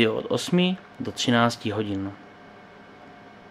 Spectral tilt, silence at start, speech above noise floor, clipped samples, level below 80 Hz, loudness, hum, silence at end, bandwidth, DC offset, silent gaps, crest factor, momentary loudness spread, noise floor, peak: -5 dB/octave; 0 s; 23 dB; under 0.1%; -66 dBFS; -25 LUFS; none; 0 s; 14 kHz; under 0.1%; none; 22 dB; 25 LU; -47 dBFS; -4 dBFS